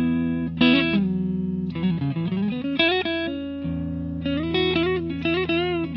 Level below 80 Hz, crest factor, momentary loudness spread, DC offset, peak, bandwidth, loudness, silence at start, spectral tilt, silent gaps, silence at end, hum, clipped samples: -50 dBFS; 18 dB; 9 LU; under 0.1%; -4 dBFS; 5.8 kHz; -23 LUFS; 0 s; -9 dB/octave; none; 0 s; none; under 0.1%